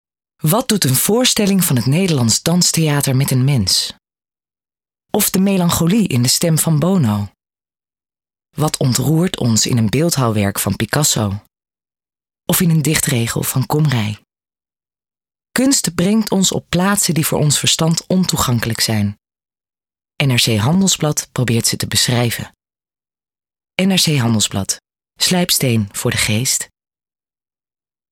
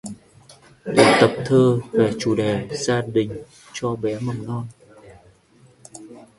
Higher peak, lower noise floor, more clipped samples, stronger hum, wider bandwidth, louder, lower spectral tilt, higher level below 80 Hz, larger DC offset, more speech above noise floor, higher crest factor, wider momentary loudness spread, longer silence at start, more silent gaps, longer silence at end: about the same, 0 dBFS vs 0 dBFS; first, under -90 dBFS vs -54 dBFS; neither; neither; first, 18.5 kHz vs 11.5 kHz; first, -15 LUFS vs -20 LUFS; second, -4 dB/octave vs -5.5 dB/octave; first, -46 dBFS vs -54 dBFS; neither; first, over 75 dB vs 34 dB; second, 16 dB vs 22 dB; second, 7 LU vs 22 LU; first, 0.45 s vs 0.05 s; neither; first, 1.45 s vs 0.2 s